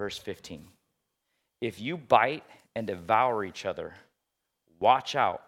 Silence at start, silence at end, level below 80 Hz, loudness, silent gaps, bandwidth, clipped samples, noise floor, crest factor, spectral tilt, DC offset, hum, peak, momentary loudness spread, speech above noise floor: 0 s; 0.1 s; -70 dBFS; -28 LUFS; none; 15.5 kHz; under 0.1%; -83 dBFS; 24 dB; -4.5 dB/octave; under 0.1%; none; -6 dBFS; 17 LU; 54 dB